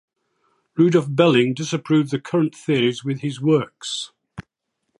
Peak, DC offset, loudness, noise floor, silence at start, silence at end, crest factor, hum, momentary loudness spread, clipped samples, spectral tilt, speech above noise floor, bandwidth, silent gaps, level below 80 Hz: -2 dBFS; under 0.1%; -20 LUFS; -76 dBFS; 0.75 s; 0.6 s; 20 dB; none; 16 LU; under 0.1%; -6 dB/octave; 57 dB; 11 kHz; none; -62 dBFS